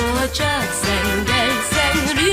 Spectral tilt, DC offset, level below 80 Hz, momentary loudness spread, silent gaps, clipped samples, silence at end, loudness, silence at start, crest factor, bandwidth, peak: -3 dB/octave; under 0.1%; -32 dBFS; 3 LU; none; under 0.1%; 0 s; -18 LUFS; 0 s; 14 dB; 16 kHz; -4 dBFS